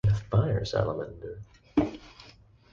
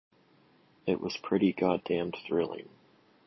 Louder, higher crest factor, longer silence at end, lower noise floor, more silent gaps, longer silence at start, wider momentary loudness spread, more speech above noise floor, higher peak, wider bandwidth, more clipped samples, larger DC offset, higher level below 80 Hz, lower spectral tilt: about the same, -29 LUFS vs -31 LUFS; about the same, 18 dB vs 20 dB; second, 0.4 s vs 0.65 s; second, -55 dBFS vs -64 dBFS; neither; second, 0.05 s vs 0.85 s; first, 20 LU vs 9 LU; second, 27 dB vs 34 dB; about the same, -12 dBFS vs -12 dBFS; first, 7.2 kHz vs 6.2 kHz; neither; neither; first, -44 dBFS vs -66 dBFS; about the same, -8 dB/octave vs -7 dB/octave